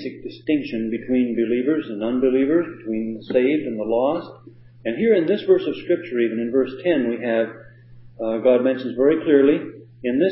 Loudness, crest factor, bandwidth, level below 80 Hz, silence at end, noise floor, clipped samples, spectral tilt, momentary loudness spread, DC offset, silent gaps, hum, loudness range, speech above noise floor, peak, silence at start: -21 LUFS; 18 dB; 5.8 kHz; -58 dBFS; 0 s; -45 dBFS; under 0.1%; -11 dB/octave; 10 LU; under 0.1%; none; none; 2 LU; 24 dB; -4 dBFS; 0 s